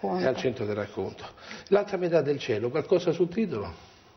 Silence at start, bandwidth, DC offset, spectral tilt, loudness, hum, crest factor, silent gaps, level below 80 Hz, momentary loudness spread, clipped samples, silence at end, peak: 0 s; 6.4 kHz; under 0.1%; -6.5 dB/octave; -28 LUFS; none; 18 dB; none; -60 dBFS; 13 LU; under 0.1%; 0.3 s; -10 dBFS